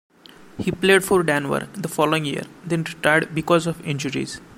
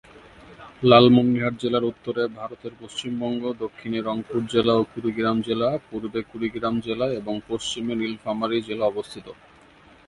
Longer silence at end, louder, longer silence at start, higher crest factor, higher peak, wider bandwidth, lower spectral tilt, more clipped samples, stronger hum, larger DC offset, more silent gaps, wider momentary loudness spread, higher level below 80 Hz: second, 0.05 s vs 0.75 s; about the same, -21 LUFS vs -23 LUFS; first, 0.55 s vs 0.15 s; about the same, 20 dB vs 24 dB; about the same, -2 dBFS vs 0 dBFS; first, 16.5 kHz vs 11.5 kHz; about the same, -5 dB/octave vs -6 dB/octave; neither; neither; neither; neither; second, 11 LU vs 14 LU; about the same, -54 dBFS vs -56 dBFS